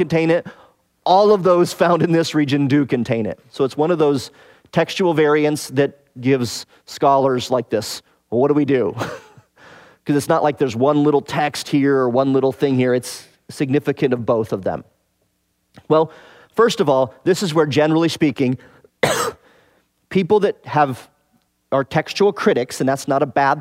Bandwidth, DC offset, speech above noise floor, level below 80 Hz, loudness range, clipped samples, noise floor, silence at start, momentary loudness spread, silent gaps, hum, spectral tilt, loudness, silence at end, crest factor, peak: 16 kHz; under 0.1%; 50 dB; -60 dBFS; 4 LU; under 0.1%; -67 dBFS; 0 s; 10 LU; none; none; -6 dB/octave; -18 LUFS; 0 s; 16 dB; -2 dBFS